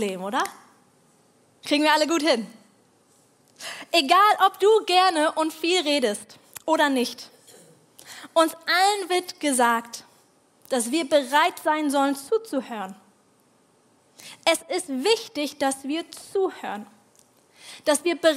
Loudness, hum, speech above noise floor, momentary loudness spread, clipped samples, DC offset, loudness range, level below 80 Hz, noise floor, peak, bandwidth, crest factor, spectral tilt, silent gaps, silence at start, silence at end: -22 LUFS; none; 38 dB; 18 LU; under 0.1%; under 0.1%; 7 LU; -80 dBFS; -61 dBFS; -2 dBFS; 16 kHz; 22 dB; -2 dB/octave; none; 0 s; 0 s